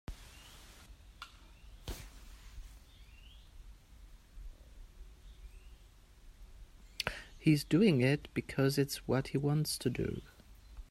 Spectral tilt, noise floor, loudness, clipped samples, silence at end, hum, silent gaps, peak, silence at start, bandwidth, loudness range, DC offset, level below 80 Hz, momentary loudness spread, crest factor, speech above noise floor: -6 dB/octave; -59 dBFS; -33 LUFS; under 0.1%; 0.1 s; none; none; -16 dBFS; 0.1 s; 16 kHz; 22 LU; under 0.1%; -54 dBFS; 28 LU; 22 dB; 27 dB